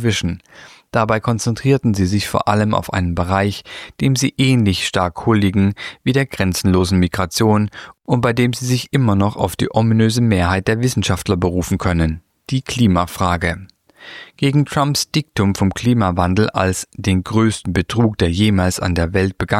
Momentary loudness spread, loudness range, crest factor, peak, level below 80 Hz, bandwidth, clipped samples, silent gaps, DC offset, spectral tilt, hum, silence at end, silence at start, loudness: 7 LU; 2 LU; 16 dB; -2 dBFS; -38 dBFS; 16 kHz; under 0.1%; none; under 0.1%; -5.5 dB/octave; none; 0 s; 0 s; -17 LUFS